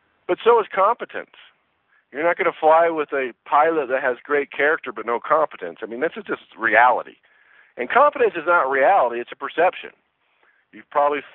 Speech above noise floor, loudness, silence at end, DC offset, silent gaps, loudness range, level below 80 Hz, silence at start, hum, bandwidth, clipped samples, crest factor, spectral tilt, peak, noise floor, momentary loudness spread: 44 dB; -20 LUFS; 0.1 s; under 0.1%; none; 3 LU; -72 dBFS; 0.3 s; none; 4.1 kHz; under 0.1%; 20 dB; -8 dB/octave; -2 dBFS; -64 dBFS; 15 LU